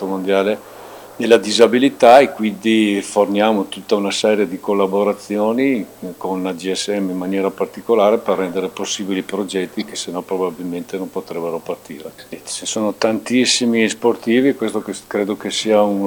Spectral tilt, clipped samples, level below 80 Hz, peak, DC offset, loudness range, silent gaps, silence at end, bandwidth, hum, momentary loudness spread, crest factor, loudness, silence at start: -4 dB/octave; under 0.1%; -62 dBFS; 0 dBFS; under 0.1%; 9 LU; none; 0 s; 19 kHz; none; 13 LU; 18 dB; -17 LUFS; 0 s